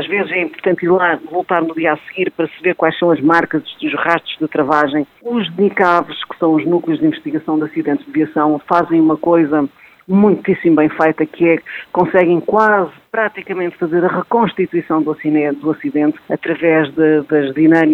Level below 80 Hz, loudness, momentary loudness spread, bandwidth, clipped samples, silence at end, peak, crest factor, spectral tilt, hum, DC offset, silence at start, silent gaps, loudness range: -58 dBFS; -15 LUFS; 7 LU; 5.6 kHz; under 0.1%; 0 s; 0 dBFS; 14 dB; -8 dB/octave; none; under 0.1%; 0 s; none; 2 LU